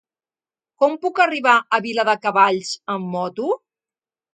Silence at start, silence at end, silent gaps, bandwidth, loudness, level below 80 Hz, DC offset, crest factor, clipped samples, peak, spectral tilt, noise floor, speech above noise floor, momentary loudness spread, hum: 0.8 s; 0.8 s; none; 9.4 kHz; -19 LUFS; -76 dBFS; under 0.1%; 20 dB; under 0.1%; 0 dBFS; -4 dB/octave; under -90 dBFS; over 71 dB; 10 LU; none